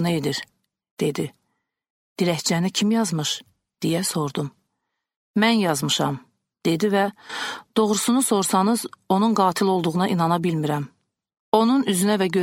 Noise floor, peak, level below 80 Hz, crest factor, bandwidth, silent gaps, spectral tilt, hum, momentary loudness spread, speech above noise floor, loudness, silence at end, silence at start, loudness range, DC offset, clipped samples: -79 dBFS; -2 dBFS; -66 dBFS; 20 dB; 16.5 kHz; 0.91-0.97 s, 1.90-2.16 s, 5.16-5.34 s, 11.40-11.52 s; -4.5 dB/octave; none; 11 LU; 58 dB; -22 LUFS; 0 s; 0 s; 4 LU; under 0.1%; under 0.1%